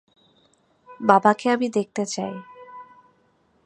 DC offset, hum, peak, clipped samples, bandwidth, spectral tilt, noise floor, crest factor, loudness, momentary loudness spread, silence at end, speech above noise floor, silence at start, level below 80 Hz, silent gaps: under 0.1%; none; -2 dBFS; under 0.1%; 10.5 kHz; -5 dB/octave; -63 dBFS; 24 dB; -21 LUFS; 25 LU; 0.85 s; 43 dB; 0.9 s; -74 dBFS; none